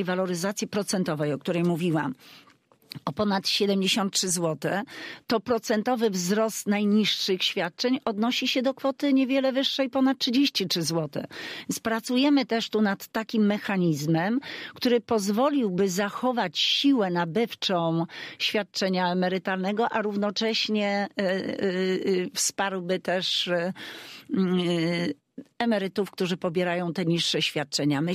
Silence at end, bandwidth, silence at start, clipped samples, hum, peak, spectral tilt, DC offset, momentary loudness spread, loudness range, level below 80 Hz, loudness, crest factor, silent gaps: 0 s; 15.5 kHz; 0 s; under 0.1%; none; -12 dBFS; -4.5 dB/octave; under 0.1%; 7 LU; 3 LU; -72 dBFS; -26 LUFS; 14 dB; none